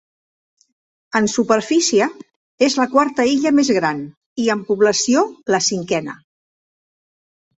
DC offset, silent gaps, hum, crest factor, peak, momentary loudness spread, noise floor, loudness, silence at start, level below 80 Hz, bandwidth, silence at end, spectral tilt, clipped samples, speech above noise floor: under 0.1%; 2.36-2.58 s, 4.17-4.36 s; none; 18 dB; -2 dBFS; 8 LU; under -90 dBFS; -17 LUFS; 1.15 s; -62 dBFS; 8.2 kHz; 1.45 s; -3.5 dB/octave; under 0.1%; over 73 dB